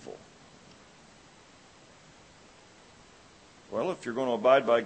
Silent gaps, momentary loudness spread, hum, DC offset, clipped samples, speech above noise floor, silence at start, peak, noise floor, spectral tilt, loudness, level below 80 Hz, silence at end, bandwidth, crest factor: none; 22 LU; none; under 0.1%; under 0.1%; 30 dB; 0 s; -10 dBFS; -56 dBFS; -5 dB/octave; -28 LUFS; -70 dBFS; 0 s; 8.8 kHz; 22 dB